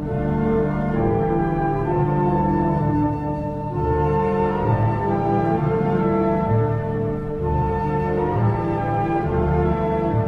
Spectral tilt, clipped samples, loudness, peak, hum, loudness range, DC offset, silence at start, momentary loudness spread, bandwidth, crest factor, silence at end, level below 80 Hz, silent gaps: -10.5 dB/octave; under 0.1%; -21 LUFS; -6 dBFS; none; 1 LU; under 0.1%; 0 s; 4 LU; 5.6 kHz; 14 dB; 0 s; -32 dBFS; none